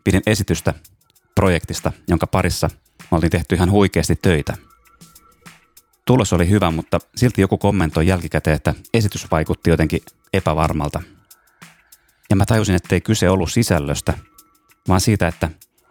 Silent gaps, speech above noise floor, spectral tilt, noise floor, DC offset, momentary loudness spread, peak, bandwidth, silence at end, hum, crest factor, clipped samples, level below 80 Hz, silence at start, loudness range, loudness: none; 36 dB; -6 dB/octave; -54 dBFS; under 0.1%; 9 LU; 0 dBFS; 19 kHz; 0.35 s; none; 18 dB; under 0.1%; -34 dBFS; 0.05 s; 3 LU; -18 LUFS